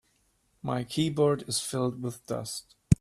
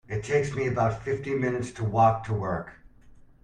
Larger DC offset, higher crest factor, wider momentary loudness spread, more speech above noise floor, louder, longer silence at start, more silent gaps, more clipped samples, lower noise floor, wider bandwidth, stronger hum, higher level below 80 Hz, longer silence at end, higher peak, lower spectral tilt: neither; first, 26 dB vs 18 dB; first, 12 LU vs 9 LU; first, 41 dB vs 26 dB; second, -30 LUFS vs -27 LUFS; first, 0.65 s vs 0.1 s; neither; neither; first, -70 dBFS vs -52 dBFS; first, 15 kHz vs 10 kHz; neither; about the same, -50 dBFS vs -52 dBFS; second, 0.05 s vs 0.35 s; first, -4 dBFS vs -8 dBFS; second, -5.5 dB/octave vs -7 dB/octave